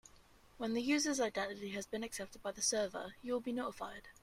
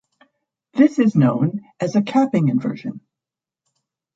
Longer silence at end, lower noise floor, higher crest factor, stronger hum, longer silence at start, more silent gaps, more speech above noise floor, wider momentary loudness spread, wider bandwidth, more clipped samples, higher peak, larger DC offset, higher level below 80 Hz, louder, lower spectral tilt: second, 0.1 s vs 1.15 s; second, -64 dBFS vs -88 dBFS; about the same, 18 dB vs 18 dB; neither; second, 0.05 s vs 0.75 s; neither; second, 25 dB vs 71 dB; about the same, 11 LU vs 12 LU; first, 16 kHz vs 7.8 kHz; neither; second, -22 dBFS vs -2 dBFS; neither; about the same, -68 dBFS vs -64 dBFS; second, -39 LUFS vs -19 LUFS; second, -2.5 dB/octave vs -8 dB/octave